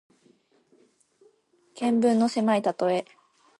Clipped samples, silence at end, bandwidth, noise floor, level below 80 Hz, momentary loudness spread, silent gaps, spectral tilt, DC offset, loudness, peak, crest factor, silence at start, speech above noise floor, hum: under 0.1%; 0.55 s; 11.5 kHz; -63 dBFS; -76 dBFS; 7 LU; none; -6 dB/octave; under 0.1%; -24 LUFS; -10 dBFS; 16 dB; 1.75 s; 40 dB; none